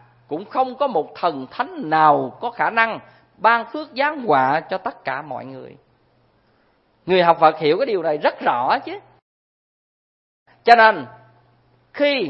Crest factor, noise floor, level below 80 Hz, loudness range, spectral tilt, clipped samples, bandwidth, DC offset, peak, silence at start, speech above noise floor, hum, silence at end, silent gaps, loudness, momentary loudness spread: 20 dB; -61 dBFS; -66 dBFS; 4 LU; -6.5 dB/octave; under 0.1%; 7.2 kHz; under 0.1%; 0 dBFS; 0.3 s; 42 dB; none; 0 s; 9.22-10.46 s; -19 LUFS; 18 LU